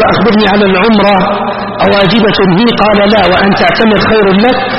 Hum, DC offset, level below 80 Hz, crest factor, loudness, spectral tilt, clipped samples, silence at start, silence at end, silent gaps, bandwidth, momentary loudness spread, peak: none; under 0.1%; -32 dBFS; 6 dB; -7 LUFS; -7.5 dB/octave; 0.2%; 0 s; 0 s; none; 6 kHz; 3 LU; 0 dBFS